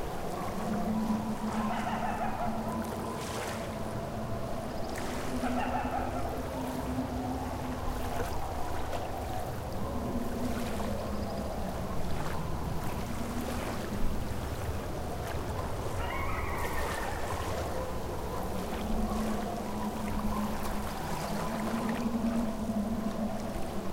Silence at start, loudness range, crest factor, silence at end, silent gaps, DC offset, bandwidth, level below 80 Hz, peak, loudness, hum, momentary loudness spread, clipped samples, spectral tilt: 0 s; 2 LU; 16 dB; 0 s; none; under 0.1%; 16.5 kHz; -40 dBFS; -18 dBFS; -35 LUFS; none; 4 LU; under 0.1%; -6 dB/octave